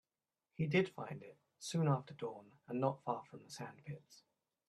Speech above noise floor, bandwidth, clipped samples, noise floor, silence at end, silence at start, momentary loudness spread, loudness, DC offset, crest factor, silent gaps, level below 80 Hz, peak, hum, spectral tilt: over 50 dB; 12.5 kHz; under 0.1%; under -90 dBFS; 0.55 s; 0.6 s; 17 LU; -40 LUFS; under 0.1%; 22 dB; none; -80 dBFS; -20 dBFS; none; -6.5 dB/octave